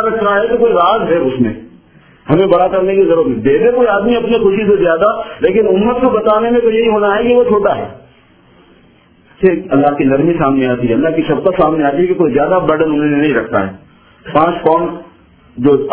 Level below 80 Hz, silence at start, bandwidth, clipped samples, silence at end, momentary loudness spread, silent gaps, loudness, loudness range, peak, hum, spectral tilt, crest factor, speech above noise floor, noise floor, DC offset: -42 dBFS; 0 s; 4 kHz; 0.1%; 0 s; 5 LU; none; -12 LUFS; 3 LU; 0 dBFS; none; -10.5 dB/octave; 12 dB; 35 dB; -47 dBFS; under 0.1%